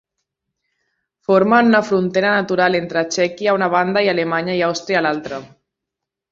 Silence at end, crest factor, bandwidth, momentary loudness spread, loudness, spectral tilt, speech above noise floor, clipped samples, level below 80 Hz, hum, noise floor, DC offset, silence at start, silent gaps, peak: 0.85 s; 16 dB; 7.8 kHz; 8 LU; -17 LUFS; -5 dB/octave; 66 dB; under 0.1%; -60 dBFS; none; -83 dBFS; under 0.1%; 1.3 s; none; -2 dBFS